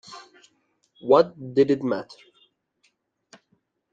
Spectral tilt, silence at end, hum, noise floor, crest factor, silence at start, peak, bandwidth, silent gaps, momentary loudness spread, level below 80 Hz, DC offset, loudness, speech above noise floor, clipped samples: -7 dB/octave; 1.9 s; none; -70 dBFS; 22 dB; 0.1 s; -4 dBFS; 7.8 kHz; none; 25 LU; -68 dBFS; under 0.1%; -22 LUFS; 49 dB; under 0.1%